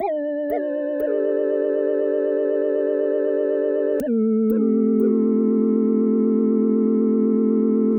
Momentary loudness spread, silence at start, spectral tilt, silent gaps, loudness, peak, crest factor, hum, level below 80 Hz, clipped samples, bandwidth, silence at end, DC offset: 5 LU; 0 s; -10 dB/octave; none; -20 LUFS; -8 dBFS; 10 dB; none; -64 dBFS; under 0.1%; 16 kHz; 0 s; under 0.1%